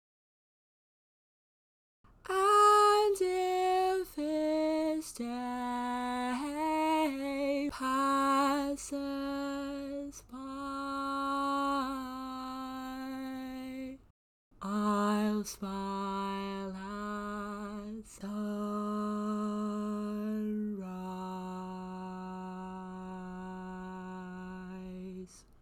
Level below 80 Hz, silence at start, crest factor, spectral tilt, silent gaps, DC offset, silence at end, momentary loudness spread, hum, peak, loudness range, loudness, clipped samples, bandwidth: -62 dBFS; 2.25 s; 20 dB; -5 dB/octave; 14.10-14.51 s; under 0.1%; 0.2 s; 15 LU; none; -16 dBFS; 12 LU; -33 LUFS; under 0.1%; 18.5 kHz